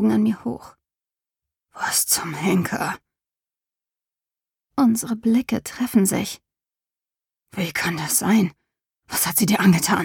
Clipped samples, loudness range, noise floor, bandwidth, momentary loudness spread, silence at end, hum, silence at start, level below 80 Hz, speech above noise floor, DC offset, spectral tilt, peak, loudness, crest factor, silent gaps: under 0.1%; 2 LU; under -90 dBFS; 19 kHz; 13 LU; 0 s; none; 0 s; -58 dBFS; over 70 dB; under 0.1%; -4 dB/octave; -4 dBFS; -21 LUFS; 18 dB; none